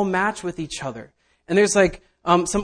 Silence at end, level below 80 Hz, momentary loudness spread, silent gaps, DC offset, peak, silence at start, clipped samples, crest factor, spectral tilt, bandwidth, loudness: 0 s; -46 dBFS; 13 LU; none; under 0.1%; -2 dBFS; 0 s; under 0.1%; 20 dB; -4 dB/octave; 10.5 kHz; -21 LUFS